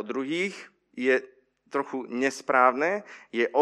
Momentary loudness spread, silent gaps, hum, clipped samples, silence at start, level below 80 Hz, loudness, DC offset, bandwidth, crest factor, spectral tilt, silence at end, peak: 12 LU; none; none; under 0.1%; 0 s; -84 dBFS; -27 LUFS; under 0.1%; 12 kHz; 20 dB; -4 dB/octave; 0 s; -6 dBFS